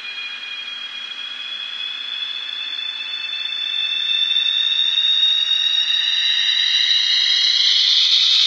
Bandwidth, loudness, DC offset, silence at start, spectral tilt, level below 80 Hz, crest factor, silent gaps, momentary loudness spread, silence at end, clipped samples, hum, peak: 9.6 kHz; -15 LUFS; under 0.1%; 0 s; 4.5 dB/octave; -84 dBFS; 16 dB; none; 14 LU; 0 s; under 0.1%; none; -2 dBFS